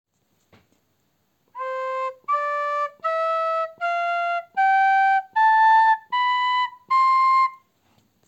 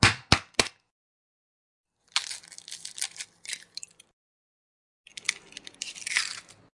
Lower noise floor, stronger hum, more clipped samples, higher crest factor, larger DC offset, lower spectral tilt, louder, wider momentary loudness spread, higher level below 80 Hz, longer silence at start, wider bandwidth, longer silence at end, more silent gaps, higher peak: first, -69 dBFS vs -47 dBFS; neither; neither; second, 12 dB vs 32 dB; neither; second, 0 dB/octave vs -2 dB/octave; first, -21 LUFS vs -29 LUFS; second, 10 LU vs 18 LU; second, -76 dBFS vs -50 dBFS; first, 1.55 s vs 0 s; second, 8.4 kHz vs 11.5 kHz; first, 0.7 s vs 0.35 s; second, none vs 0.91-1.84 s, 4.13-5.04 s; second, -10 dBFS vs 0 dBFS